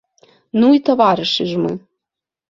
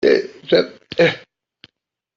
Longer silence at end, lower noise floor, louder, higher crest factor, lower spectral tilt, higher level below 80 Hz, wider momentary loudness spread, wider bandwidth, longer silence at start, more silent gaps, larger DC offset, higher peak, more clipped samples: second, 0.7 s vs 1 s; first, -85 dBFS vs -76 dBFS; first, -15 LUFS vs -18 LUFS; about the same, 16 dB vs 18 dB; about the same, -6 dB/octave vs -6 dB/octave; about the same, -60 dBFS vs -60 dBFS; about the same, 10 LU vs 8 LU; about the same, 7.4 kHz vs 7.4 kHz; first, 0.55 s vs 0 s; neither; neither; about the same, -2 dBFS vs -2 dBFS; neither